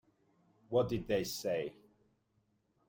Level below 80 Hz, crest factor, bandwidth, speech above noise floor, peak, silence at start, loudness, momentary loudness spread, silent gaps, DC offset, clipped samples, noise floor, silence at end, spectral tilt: -64 dBFS; 18 dB; 16.5 kHz; 42 dB; -20 dBFS; 0.7 s; -36 LUFS; 5 LU; none; under 0.1%; under 0.1%; -77 dBFS; 1.15 s; -5 dB/octave